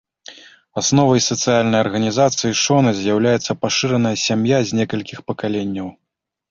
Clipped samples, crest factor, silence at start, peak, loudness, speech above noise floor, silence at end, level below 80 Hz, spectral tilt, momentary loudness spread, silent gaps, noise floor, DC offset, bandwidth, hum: under 0.1%; 16 dB; 0.3 s; -2 dBFS; -17 LUFS; 25 dB; 0.6 s; -54 dBFS; -4.5 dB/octave; 10 LU; none; -42 dBFS; under 0.1%; 7.6 kHz; none